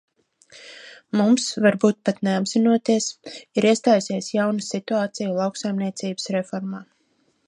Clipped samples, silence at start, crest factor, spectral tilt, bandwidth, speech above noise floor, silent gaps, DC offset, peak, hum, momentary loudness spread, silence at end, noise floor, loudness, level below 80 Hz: under 0.1%; 0.55 s; 18 dB; -5 dB/octave; 11 kHz; 45 dB; none; under 0.1%; -4 dBFS; none; 14 LU; 0.65 s; -66 dBFS; -22 LUFS; -72 dBFS